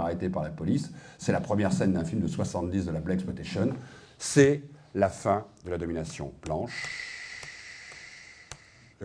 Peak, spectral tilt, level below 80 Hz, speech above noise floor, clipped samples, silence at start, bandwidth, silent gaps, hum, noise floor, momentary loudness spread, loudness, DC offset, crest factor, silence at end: -6 dBFS; -6 dB/octave; -52 dBFS; 23 dB; under 0.1%; 0 s; 10.5 kHz; none; none; -52 dBFS; 18 LU; -29 LUFS; under 0.1%; 24 dB; 0 s